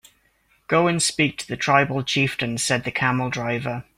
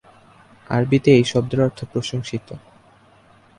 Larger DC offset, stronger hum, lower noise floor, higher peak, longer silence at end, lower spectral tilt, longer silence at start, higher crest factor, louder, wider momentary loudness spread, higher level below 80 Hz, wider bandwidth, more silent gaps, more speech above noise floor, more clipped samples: neither; neither; first, -63 dBFS vs -52 dBFS; about the same, -2 dBFS vs -2 dBFS; second, 0.15 s vs 1 s; second, -4 dB/octave vs -6.5 dB/octave; about the same, 0.7 s vs 0.7 s; about the same, 20 dB vs 20 dB; about the same, -21 LUFS vs -19 LUFS; second, 6 LU vs 17 LU; about the same, -56 dBFS vs -52 dBFS; first, 16 kHz vs 11 kHz; neither; first, 41 dB vs 33 dB; neither